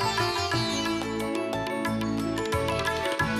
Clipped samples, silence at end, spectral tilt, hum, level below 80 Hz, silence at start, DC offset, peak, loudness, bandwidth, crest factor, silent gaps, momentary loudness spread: under 0.1%; 0 s; -4.5 dB/octave; none; -48 dBFS; 0 s; under 0.1%; -16 dBFS; -28 LUFS; 15.5 kHz; 12 dB; none; 4 LU